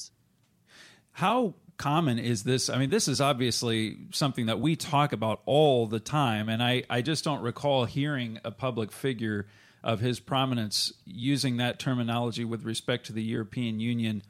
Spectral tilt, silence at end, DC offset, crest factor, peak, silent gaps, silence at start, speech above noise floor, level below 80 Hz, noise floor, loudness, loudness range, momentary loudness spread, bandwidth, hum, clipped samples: -5 dB/octave; 0.1 s; under 0.1%; 18 dB; -10 dBFS; none; 0 s; 39 dB; -64 dBFS; -67 dBFS; -28 LUFS; 4 LU; 7 LU; 15.5 kHz; none; under 0.1%